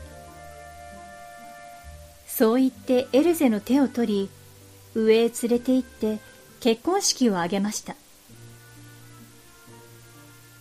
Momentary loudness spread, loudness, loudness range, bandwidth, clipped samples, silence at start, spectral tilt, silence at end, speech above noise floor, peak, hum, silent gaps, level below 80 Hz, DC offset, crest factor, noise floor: 23 LU; -23 LUFS; 5 LU; 15.5 kHz; under 0.1%; 0 s; -4 dB/octave; 0.85 s; 27 dB; -8 dBFS; none; none; -58 dBFS; under 0.1%; 18 dB; -49 dBFS